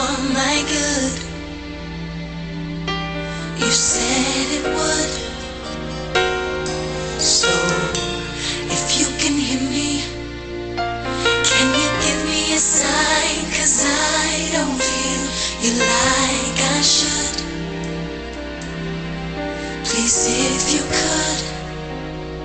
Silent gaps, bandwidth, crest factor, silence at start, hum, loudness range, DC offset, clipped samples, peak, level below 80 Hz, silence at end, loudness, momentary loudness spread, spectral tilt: none; 9.4 kHz; 16 dB; 0 s; none; 5 LU; under 0.1%; under 0.1%; -4 dBFS; -36 dBFS; 0 s; -18 LUFS; 14 LU; -2 dB/octave